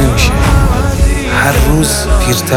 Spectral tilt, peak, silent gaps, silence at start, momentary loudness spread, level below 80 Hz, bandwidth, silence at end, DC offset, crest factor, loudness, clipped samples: -4.5 dB/octave; 0 dBFS; none; 0 s; 2 LU; -12 dBFS; 17.5 kHz; 0 s; under 0.1%; 10 dB; -11 LUFS; under 0.1%